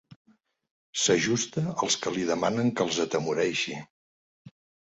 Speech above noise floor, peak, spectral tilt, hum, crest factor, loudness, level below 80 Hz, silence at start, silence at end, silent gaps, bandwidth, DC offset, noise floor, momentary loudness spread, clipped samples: over 63 dB; -10 dBFS; -3.5 dB/octave; none; 18 dB; -27 LUFS; -66 dBFS; 0.1 s; 0.35 s; 0.16-0.25 s, 0.71-0.93 s, 3.90-4.45 s; 8.4 kHz; under 0.1%; under -90 dBFS; 6 LU; under 0.1%